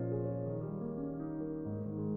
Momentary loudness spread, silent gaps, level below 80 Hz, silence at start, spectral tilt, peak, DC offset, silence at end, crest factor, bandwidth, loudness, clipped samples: 3 LU; none; -60 dBFS; 0 s; -14 dB/octave; -24 dBFS; under 0.1%; 0 s; 14 dB; 2.3 kHz; -39 LUFS; under 0.1%